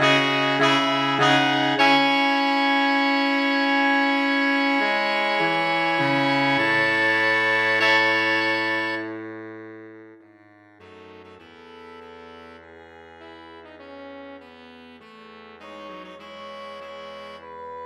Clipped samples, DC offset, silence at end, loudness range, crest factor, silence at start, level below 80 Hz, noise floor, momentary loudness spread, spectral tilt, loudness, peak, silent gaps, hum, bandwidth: under 0.1%; under 0.1%; 0 s; 22 LU; 20 dB; 0 s; -70 dBFS; -52 dBFS; 22 LU; -4 dB/octave; -19 LUFS; -4 dBFS; none; none; 13 kHz